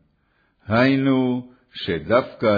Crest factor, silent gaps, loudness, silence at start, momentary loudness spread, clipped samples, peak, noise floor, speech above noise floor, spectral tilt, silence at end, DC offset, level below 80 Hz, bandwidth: 16 dB; none; -21 LUFS; 0.7 s; 12 LU; under 0.1%; -4 dBFS; -65 dBFS; 45 dB; -8.5 dB/octave; 0 s; under 0.1%; -54 dBFS; 5 kHz